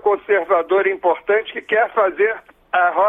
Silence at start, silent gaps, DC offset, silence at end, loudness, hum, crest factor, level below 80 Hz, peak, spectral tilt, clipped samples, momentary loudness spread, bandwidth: 0.05 s; none; under 0.1%; 0 s; -18 LUFS; none; 14 dB; -60 dBFS; -4 dBFS; -6 dB/octave; under 0.1%; 4 LU; 3.8 kHz